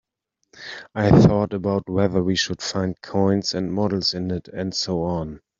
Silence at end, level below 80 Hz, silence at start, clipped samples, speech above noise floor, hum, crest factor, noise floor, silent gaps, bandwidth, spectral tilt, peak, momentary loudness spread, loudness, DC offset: 0.25 s; -46 dBFS; 0.55 s; under 0.1%; 55 dB; none; 20 dB; -76 dBFS; none; 7.6 kHz; -6 dB/octave; -2 dBFS; 13 LU; -21 LUFS; under 0.1%